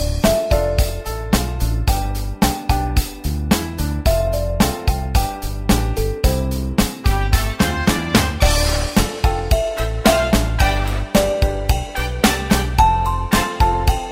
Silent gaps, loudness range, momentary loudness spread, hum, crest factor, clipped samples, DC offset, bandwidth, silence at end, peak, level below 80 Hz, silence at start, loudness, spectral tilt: none; 3 LU; 6 LU; none; 16 dB; under 0.1%; under 0.1%; 16.5 kHz; 0 s; 0 dBFS; -22 dBFS; 0 s; -19 LUFS; -5 dB/octave